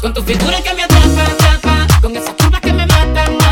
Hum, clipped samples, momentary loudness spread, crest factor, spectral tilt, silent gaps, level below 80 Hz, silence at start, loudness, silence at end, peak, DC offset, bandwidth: none; 0.3%; 5 LU; 10 dB; -5 dB/octave; none; -14 dBFS; 0 s; -11 LUFS; 0 s; 0 dBFS; under 0.1%; 17.5 kHz